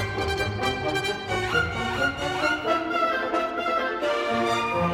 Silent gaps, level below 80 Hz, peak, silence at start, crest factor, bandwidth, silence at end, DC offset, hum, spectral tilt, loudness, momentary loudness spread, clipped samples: none; -46 dBFS; -10 dBFS; 0 s; 16 dB; 17.5 kHz; 0 s; under 0.1%; none; -4.5 dB/octave; -25 LUFS; 3 LU; under 0.1%